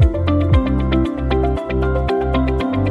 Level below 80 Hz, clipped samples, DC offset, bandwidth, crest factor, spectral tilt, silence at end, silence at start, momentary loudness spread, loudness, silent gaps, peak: -22 dBFS; under 0.1%; under 0.1%; 5.2 kHz; 12 dB; -9 dB/octave; 0 s; 0 s; 4 LU; -18 LUFS; none; -4 dBFS